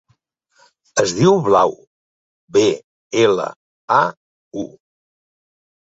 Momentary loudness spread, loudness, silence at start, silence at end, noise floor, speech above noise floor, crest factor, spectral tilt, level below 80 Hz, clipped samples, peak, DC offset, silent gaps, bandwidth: 16 LU; -17 LUFS; 0.95 s; 1.3 s; -64 dBFS; 48 dB; 18 dB; -5 dB/octave; -58 dBFS; under 0.1%; -2 dBFS; under 0.1%; 1.87-2.48 s, 2.84-3.10 s, 3.56-3.88 s, 4.17-4.51 s; 8 kHz